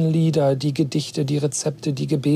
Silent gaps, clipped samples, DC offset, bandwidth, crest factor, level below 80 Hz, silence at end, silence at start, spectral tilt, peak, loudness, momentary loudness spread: none; under 0.1%; under 0.1%; 13.5 kHz; 12 dB; -62 dBFS; 0 s; 0 s; -6 dB/octave; -8 dBFS; -22 LUFS; 5 LU